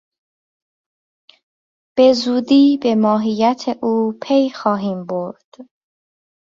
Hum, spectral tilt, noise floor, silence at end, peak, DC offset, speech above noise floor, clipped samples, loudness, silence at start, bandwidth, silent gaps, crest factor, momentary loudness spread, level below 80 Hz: none; -6 dB/octave; under -90 dBFS; 0.95 s; -2 dBFS; under 0.1%; over 74 dB; under 0.1%; -16 LUFS; 1.95 s; 7.4 kHz; 5.44-5.52 s; 16 dB; 11 LU; -62 dBFS